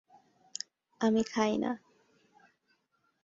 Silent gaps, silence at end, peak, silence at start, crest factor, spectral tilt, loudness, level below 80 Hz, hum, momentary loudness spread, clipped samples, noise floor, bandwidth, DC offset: none; 1.45 s; -14 dBFS; 1 s; 20 dB; -4.5 dB/octave; -32 LUFS; -72 dBFS; none; 15 LU; under 0.1%; -76 dBFS; 7.8 kHz; under 0.1%